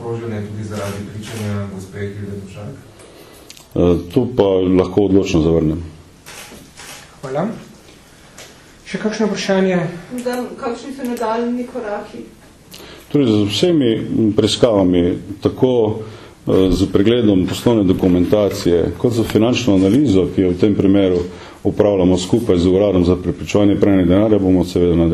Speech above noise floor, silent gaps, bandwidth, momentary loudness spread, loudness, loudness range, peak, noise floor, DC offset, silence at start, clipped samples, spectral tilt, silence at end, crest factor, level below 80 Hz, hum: 28 dB; none; 13.5 kHz; 16 LU; -16 LUFS; 10 LU; 0 dBFS; -43 dBFS; under 0.1%; 0 s; under 0.1%; -6.5 dB/octave; 0 s; 16 dB; -38 dBFS; none